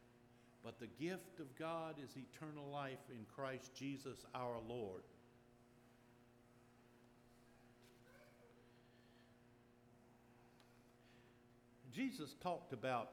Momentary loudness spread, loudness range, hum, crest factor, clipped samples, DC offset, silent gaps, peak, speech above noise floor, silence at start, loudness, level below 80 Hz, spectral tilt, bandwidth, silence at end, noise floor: 23 LU; 19 LU; none; 24 dB; under 0.1%; under 0.1%; none; -30 dBFS; 21 dB; 0 s; -50 LUFS; -82 dBFS; -5.5 dB/octave; 17.5 kHz; 0 s; -70 dBFS